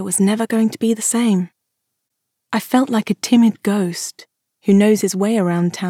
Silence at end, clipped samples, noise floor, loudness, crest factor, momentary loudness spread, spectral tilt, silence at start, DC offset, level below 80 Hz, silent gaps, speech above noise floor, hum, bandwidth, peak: 0 s; under 0.1%; -77 dBFS; -17 LUFS; 16 dB; 10 LU; -5 dB/octave; 0 s; under 0.1%; -70 dBFS; none; 60 dB; none; 16 kHz; -2 dBFS